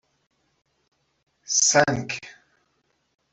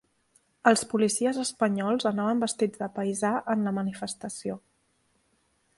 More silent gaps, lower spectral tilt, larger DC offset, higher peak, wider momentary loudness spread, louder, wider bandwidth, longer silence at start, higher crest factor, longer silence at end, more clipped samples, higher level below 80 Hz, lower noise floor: neither; second, -2 dB/octave vs -4.5 dB/octave; neither; about the same, -4 dBFS vs -4 dBFS; first, 16 LU vs 11 LU; first, -21 LUFS vs -27 LUFS; second, 8.4 kHz vs 11.5 kHz; first, 1.5 s vs 0.65 s; about the same, 24 dB vs 24 dB; second, 1 s vs 1.2 s; neither; first, -62 dBFS vs -70 dBFS; about the same, -71 dBFS vs -70 dBFS